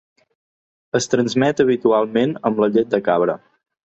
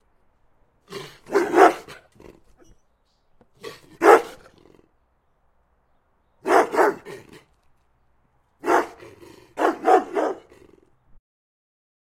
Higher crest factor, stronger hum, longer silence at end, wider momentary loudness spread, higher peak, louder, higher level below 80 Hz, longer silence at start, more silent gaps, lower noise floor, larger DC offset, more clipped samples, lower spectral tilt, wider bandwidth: second, 16 dB vs 24 dB; neither; second, 0.6 s vs 1.85 s; second, 6 LU vs 25 LU; about the same, -2 dBFS vs 0 dBFS; about the same, -18 LUFS vs -20 LUFS; about the same, -60 dBFS vs -62 dBFS; about the same, 0.95 s vs 0.9 s; neither; first, under -90 dBFS vs -65 dBFS; neither; neither; first, -5.5 dB/octave vs -4 dB/octave; second, 8.4 kHz vs 16 kHz